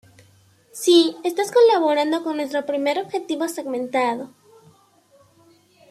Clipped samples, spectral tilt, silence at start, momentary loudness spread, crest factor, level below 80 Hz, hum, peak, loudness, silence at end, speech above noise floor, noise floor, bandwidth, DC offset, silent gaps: under 0.1%; -3 dB/octave; 0.75 s; 11 LU; 18 dB; -74 dBFS; none; -4 dBFS; -20 LUFS; 1.65 s; 37 dB; -56 dBFS; 15 kHz; under 0.1%; none